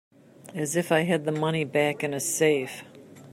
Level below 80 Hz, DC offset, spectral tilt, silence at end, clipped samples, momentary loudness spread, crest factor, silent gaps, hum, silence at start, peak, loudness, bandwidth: -72 dBFS; under 0.1%; -4.5 dB/octave; 0 s; under 0.1%; 12 LU; 18 dB; none; none; 0.45 s; -8 dBFS; -25 LUFS; 16 kHz